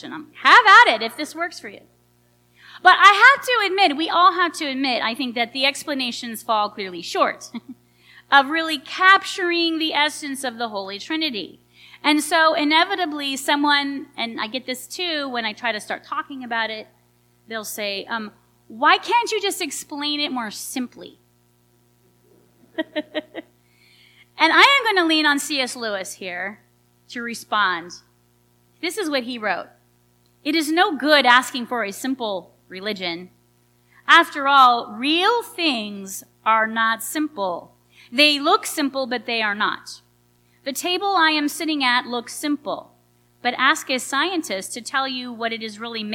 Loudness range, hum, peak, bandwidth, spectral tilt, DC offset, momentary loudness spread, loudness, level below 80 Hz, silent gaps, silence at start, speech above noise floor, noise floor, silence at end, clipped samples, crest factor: 10 LU; 60 Hz at -60 dBFS; 0 dBFS; 18 kHz; -1.5 dB/octave; under 0.1%; 16 LU; -19 LUFS; -72 dBFS; none; 0.05 s; 40 dB; -60 dBFS; 0 s; under 0.1%; 22 dB